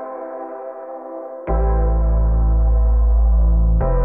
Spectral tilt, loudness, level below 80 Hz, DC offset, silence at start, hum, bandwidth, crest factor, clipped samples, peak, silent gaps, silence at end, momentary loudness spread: -14 dB/octave; -18 LUFS; -16 dBFS; under 0.1%; 0 s; none; 2.2 kHz; 8 dB; under 0.1%; -8 dBFS; none; 0 s; 14 LU